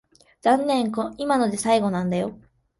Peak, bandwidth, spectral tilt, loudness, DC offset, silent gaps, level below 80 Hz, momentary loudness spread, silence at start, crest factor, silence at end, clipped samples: -6 dBFS; 12 kHz; -5.5 dB/octave; -23 LUFS; under 0.1%; none; -58 dBFS; 7 LU; 0.45 s; 16 dB; 0.45 s; under 0.1%